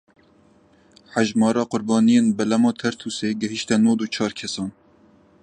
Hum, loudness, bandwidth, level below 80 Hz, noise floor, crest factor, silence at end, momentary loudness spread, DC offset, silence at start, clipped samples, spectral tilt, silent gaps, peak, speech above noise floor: none; -21 LUFS; 9.8 kHz; -62 dBFS; -56 dBFS; 18 dB; 0.75 s; 11 LU; under 0.1%; 1.15 s; under 0.1%; -5 dB/octave; none; -4 dBFS; 35 dB